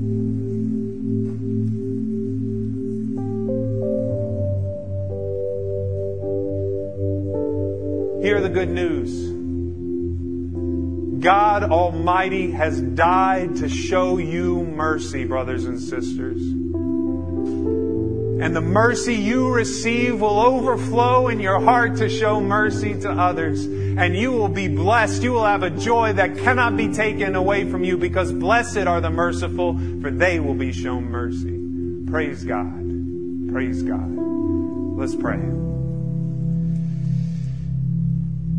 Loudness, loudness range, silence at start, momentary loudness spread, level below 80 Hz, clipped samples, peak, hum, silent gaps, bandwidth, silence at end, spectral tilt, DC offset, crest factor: -21 LUFS; 6 LU; 0 s; 9 LU; -40 dBFS; under 0.1%; 0 dBFS; none; none; 10.5 kHz; 0 s; -6.5 dB/octave; 1%; 20 dB